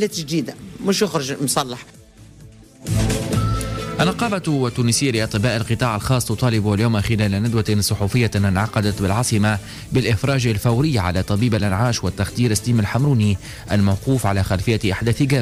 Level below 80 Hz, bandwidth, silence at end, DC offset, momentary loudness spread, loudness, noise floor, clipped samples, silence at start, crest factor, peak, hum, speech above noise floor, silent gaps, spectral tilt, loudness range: -38 dBFS; 15.5 kHz; 0 s; under 0.1%; 5 LU; -19 LUFS; -44 dBFS; under 0.1%; 0 s; 12 dB; -8 dBFS; none; 25 dB; none; -5.5 dB/octave; 4 LU